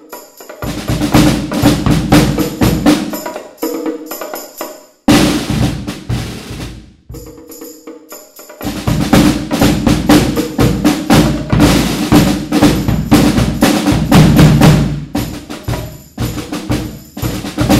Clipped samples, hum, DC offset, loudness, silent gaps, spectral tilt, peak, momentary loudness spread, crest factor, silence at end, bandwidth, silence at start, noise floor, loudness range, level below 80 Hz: 0.3%; none; under 0.1%; -12 LUFS; none; -5.5 dB/octave; 0 dBFS; 18 LU; 12 dB; 0 s; 16.5 kHz; 0.1 s; -34 dBFS; 7 LU; -26 dBFS